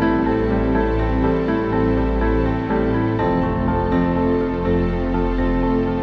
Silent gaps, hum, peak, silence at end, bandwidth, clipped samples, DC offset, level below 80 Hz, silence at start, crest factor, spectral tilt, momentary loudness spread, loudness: none; none; -6 dBFS; 0 s; 6 kHz; under 0.1%; under 0.1%; -26 dBFS; 0 s; 12 dB; -9.5 dB/octave; 2 LU; -19 LUFS